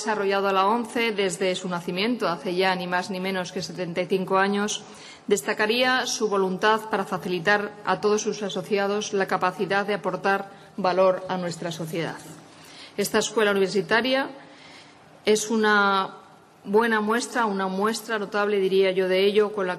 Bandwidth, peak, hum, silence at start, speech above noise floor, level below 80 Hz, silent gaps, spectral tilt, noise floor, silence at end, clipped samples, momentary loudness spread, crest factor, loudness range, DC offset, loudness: 13.5 kHz; -6 dBFS; none; 0 s; 25 dB; -70 dBFS; none; -4 dB/octave; -49 dBFS; 0 s; under 0.1%; 9 LU; 18 dB; 3 LU; under 0.1%; -24 LUFS